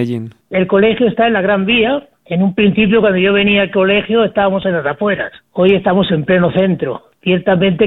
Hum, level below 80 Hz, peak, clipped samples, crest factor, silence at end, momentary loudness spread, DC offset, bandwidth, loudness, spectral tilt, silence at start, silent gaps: none; -44 dBFS; 0 dBFS; under 0.1%; 12 dB; 0 s; 9 LU; under 0.1%; 4.1 kHz; -13 LUFS; -9 dB/octave; 0 s; none